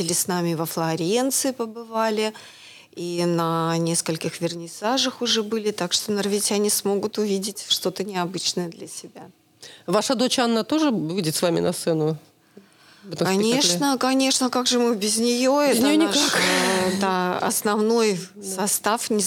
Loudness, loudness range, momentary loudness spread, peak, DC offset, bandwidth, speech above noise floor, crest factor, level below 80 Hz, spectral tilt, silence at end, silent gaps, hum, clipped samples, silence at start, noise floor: -22 LUFS; 5 LU; 10 LU; -6 dBFS; under 0.1%; 19 kHz; 29 dB; 16 dB; -72 dBFS; -3.5 dB/octave; 0 s; none; none; under 0.1%; 0 s; -52 dBFS